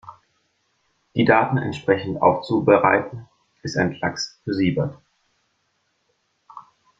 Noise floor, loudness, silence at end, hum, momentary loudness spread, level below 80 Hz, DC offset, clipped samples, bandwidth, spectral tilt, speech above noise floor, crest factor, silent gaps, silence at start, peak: -70 dBFS; -21 LUFS; 0.4 s; none; 13 LU; -58 dBFS; under 0.1%; under 0.1%; 7.8 kHz; -6 dB/octave; 50 dB; 22 dB; none; 0.05 s; -2 dBFS